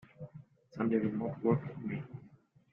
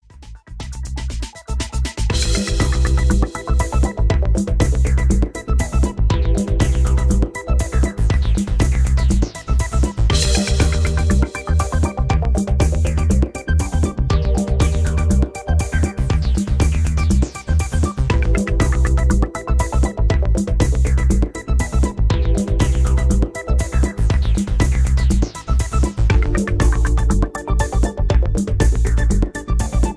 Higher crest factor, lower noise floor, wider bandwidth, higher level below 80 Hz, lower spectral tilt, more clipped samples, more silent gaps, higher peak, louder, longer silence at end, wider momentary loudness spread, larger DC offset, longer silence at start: first, 20 dB vs 14 dB; first, -61 dBFS vs -39 dBFS; second, 5.4 kHz vs 11 kHz; second, -70 dBFS vs -18 dBFS; first, -11 dB/octave vs -6 dB/octave; neither; neither; second, -16 dBFS vs -2 dBFS; second, -35 LUFS vs -19 LUFS; first, 0.45 s vs 0 s; first, 19 LU vs 4 LU; neither; about the same, 0.2 s vs 0.2 s